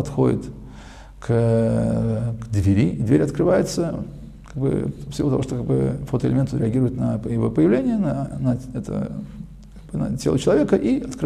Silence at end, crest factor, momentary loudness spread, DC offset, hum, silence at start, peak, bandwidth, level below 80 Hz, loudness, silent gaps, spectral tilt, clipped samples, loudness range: 0 s; 16 dB; 16 LU; under 0.1%; none; 0 s; -4 dBFS; 13.5 kHz; -40 dBFS; -21 LUFS; none; -8 dB/octave; under 0.1%; 3 LU